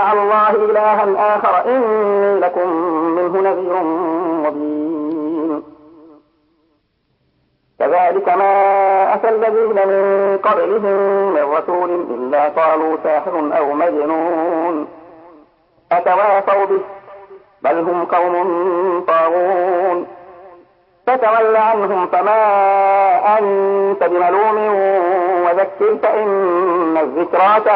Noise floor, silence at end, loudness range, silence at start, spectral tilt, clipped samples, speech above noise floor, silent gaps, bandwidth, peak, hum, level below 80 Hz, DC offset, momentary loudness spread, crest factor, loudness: -63 dBFS; 0 s; 5 LU; 0 s; -11 dB/octave; under 0.1%; 49 dB; none; 5.2 kHz; -2 dBFS; none; -66 dBFS; under 0.1%; 7 LU; 12 dB; -15 LUFS